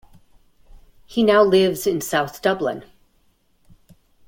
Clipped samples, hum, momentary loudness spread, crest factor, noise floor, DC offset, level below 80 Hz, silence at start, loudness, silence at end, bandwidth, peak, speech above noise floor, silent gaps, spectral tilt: under 0.1%; none; 12 LU; 20 dB; -61 dBFS; under 0.1%; -54 dBFS; 1.1 s; -19 LUFS; 1.45 s; 17 kHz; -2 dBFS; 43 dB; none; -4.5 dB/octave